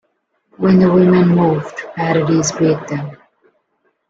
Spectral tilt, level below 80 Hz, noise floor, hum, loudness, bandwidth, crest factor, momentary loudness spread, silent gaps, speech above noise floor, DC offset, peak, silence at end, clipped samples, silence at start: -6.5 dB/octave; -52 dBFS; -66 dBFS; none; -14 LUFS; 7.8 kHz; 14 dB; 14 LU; none; 53 dB; under 0.1%; -2 dBFS; 0.95 s; under 0.1%; 0.6 s